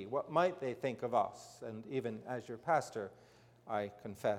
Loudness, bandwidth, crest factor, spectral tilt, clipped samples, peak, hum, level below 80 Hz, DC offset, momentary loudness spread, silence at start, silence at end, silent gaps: -38 LUFS; 16.5 kHz; 20 dB; -6 dB/octave; under 0.1%; -18 dBFS; none; -78 dBFS; under 0.1%; 14 LU; 0 s; 0 s; none